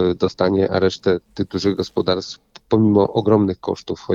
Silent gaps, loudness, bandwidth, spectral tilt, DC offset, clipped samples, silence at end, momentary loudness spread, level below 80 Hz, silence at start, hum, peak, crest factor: none; -19 LUFS; 7.6 kHz; -7 dB/octave; under 0.1%; under 0.1%; 0 s; 10 LU; -50 dBFS; 0 s; none; -2 dBFS; 16 dB